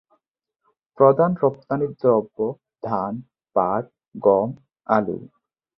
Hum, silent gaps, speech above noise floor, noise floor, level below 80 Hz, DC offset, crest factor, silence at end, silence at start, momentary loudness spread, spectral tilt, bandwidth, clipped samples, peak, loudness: none; none; 56 dB; -77 dBFS; -62 dBFS; under 0.1%; 20 dB; 0.5 s; 1 s; 15 LU; -11.5 dB/octave; 5.8 kHz; under 0.1%; -2 dBFS; -21 LUFS